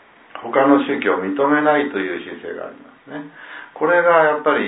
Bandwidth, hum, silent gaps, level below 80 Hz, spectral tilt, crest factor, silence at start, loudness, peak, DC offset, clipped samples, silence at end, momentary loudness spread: 4 kHz; none; none; -70 dBFS; -9.5 dB/octave; 18 dB; 0.35 s; -17 LUFS; -2 dBFS; under 0.1%; under 0.1%; 0 s; 21 LU